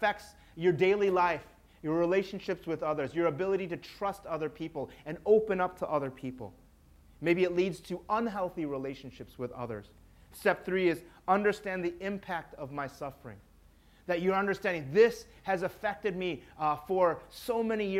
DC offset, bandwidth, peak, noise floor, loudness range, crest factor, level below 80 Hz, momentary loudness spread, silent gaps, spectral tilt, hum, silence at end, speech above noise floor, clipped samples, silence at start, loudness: under 0.1%; 15.5 kHz; -12 dBFS; -60 dBFS; 4 LU; 20 dB; -60 dBFS; 15 LU; none; -6.5 dB/octave; none; 0 s; 29 dB; under 0.1%; 0 s; -32 LUFS